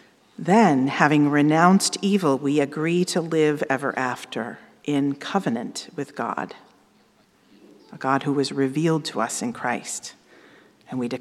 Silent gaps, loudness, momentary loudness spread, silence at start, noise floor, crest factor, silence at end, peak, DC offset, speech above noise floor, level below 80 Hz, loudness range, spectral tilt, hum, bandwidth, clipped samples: none; -22 LUFS; 15 LU; 0.4 s; -59 dBFS; 22 dB; 0 s; 0 dBFS; under 0.1%; 37 dB; -76 dBFS; 9 LU; -5 dB/octave; none; 14 kHz; under 0.1%